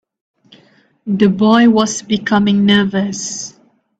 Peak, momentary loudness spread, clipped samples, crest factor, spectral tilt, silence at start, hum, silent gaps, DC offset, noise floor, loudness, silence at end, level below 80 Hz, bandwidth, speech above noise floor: 0 dBFS; 14 LU; under 0.1%; 14 dB; -4.5 dB/octave; 1.05 s; none; none; under 0.1%; -51 dBFS; -13 LUFS; 0.5 s; -54 dBFS; 8.4 kHz; 38 dB